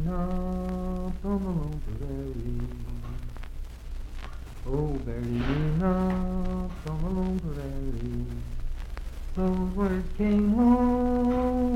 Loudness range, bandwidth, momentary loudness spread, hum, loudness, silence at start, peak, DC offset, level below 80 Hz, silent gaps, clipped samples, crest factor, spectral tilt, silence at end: 9 LU; 13.5 kHz; 17 LU; none; -29 LUFS; 0 s; -10 dBFS; under 0.1%; -34 dBFS; none; under 0.1%; 16 dB; -9 dB/octave; 0 s